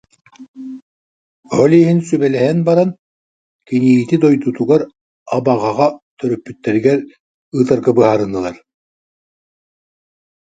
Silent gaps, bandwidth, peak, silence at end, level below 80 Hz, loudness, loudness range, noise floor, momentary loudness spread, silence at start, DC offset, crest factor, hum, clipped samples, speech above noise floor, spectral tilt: 0.48-0.54 s, 0.82-1.43 s, 2.99-3.59 s, 5.01-5.26 s, 6.02-6.17 s, 7.20-7.52 s; 9.2 kHz; 0 dBFS; 2 s; -56 dBFS; -15 LUFS; 3 LU; under -90 dBFS; 13 LU; 0.4 s; under 0.1%; 16 dB; none; under 0.1%; over 77 dB; -8 dB/octave